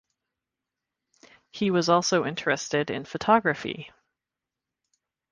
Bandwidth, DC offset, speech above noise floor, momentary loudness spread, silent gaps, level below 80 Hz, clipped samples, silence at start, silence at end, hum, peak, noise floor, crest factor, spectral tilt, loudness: 10 kHz; under 0.1%; 63 dB; 12 LU; none; -66 dBFS; under 0.1%; 1.55 s; 1.45 s; none; -6 dBFS; -88 dBFS; 22 dB; -4.5 dB/octave; -25 LUFS